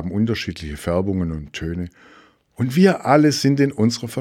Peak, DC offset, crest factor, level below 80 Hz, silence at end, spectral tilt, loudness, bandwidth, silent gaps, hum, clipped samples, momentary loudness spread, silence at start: -2 dBFS; under 0.1%; 18 dB; -42 dBFS; 0 s; -6 dB/octave; -19 LUFS; 16 kHz; none; none; under 0.1%; 13 LU; 0 s